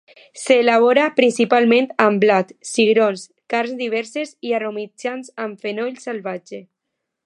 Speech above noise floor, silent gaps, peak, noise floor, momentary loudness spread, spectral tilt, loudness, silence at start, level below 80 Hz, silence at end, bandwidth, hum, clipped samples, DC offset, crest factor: 60 dB; none; 0 dBFS; -79 dBFS; 15 LU; -4.5 dB/octave; -18 LUFS; 0.35 s; -74 dBFS; 0.65 s; 11.5 kHz; none; under 0.1%; under 0.1%; 18 dB